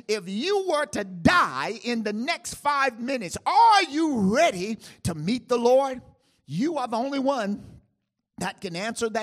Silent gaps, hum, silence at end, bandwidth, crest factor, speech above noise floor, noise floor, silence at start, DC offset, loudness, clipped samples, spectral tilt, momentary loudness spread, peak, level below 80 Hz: none; none; 0 s; 15.5 kHz; 20 dB; 52 dB; -77 dBFS; 0.1 s; under 0.1%; -24 LUFS; under 0.1%; -4.5 dB/octave; 12 LU; -4 dBFS; -56 dBFS